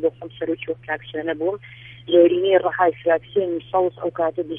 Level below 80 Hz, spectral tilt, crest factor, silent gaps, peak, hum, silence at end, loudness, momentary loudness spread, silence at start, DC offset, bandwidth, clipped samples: -60 dBFS; -9 dB/octave; 18 dB; none; -4 dBFS; none; 0 s; -21 LUFS; 12 LU; 0 s; under 0.1%; 3.7 kHz; under 0.1%